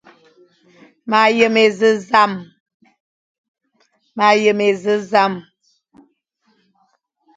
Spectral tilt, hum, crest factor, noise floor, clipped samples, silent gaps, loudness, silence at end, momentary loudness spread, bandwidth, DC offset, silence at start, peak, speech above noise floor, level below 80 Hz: -4.5 dB/octave; none; 18 dB; -64 dBFS; under 0.1%; 2.60-2.66 s, 2.74-2.80 s, 3.00-3.55 s; -15 LUFS; 1.95 s; 16 LU; 9 kHz; under 0.1%; 1.05 s; 0 dBFS; 49 dB; -66 dBFS